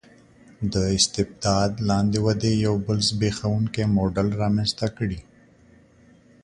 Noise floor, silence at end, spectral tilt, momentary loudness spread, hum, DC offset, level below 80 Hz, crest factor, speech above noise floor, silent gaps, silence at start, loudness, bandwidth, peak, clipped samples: -54 dBFS; 1.25 s; -5 dB/octave; 6 LU; none; under 0.1%; -44 dBFS; 18 dB; 32 dB; none; 0.6 s; -23 LUFS; 11 kHz; -4 dBFS; under 0.1%